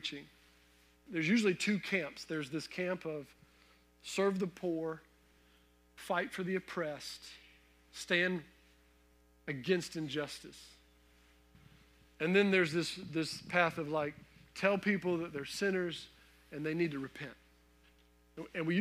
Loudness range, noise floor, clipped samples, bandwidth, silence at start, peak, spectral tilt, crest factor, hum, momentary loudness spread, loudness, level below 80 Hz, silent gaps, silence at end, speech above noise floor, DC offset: 7 LU; -67 dBFS; under 0.1%; 15.5 kHz; 0 s; -16 dBFS; -5 dB/octave; 22 dB; 60 Hz at -65 dBFS; 19 LU; -35 LUFS; -70 dBFS; none; 0 s; 32 dB; under 0.1%